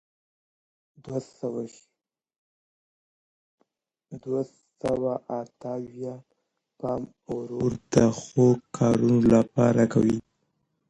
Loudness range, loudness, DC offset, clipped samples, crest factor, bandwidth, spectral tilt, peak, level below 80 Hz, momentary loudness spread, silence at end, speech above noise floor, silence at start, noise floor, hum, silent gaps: 17 LU; -25 LUFS; under 0.1%; under 0.1%; 20 dB; 10.5 kHz; -7.5 dB/octave; -6 dBFS; -54 dBFS; 16 LU; 0.7 s; 51 dB; 1.05 s; -76 dBFS; none; 2.38-3.58 s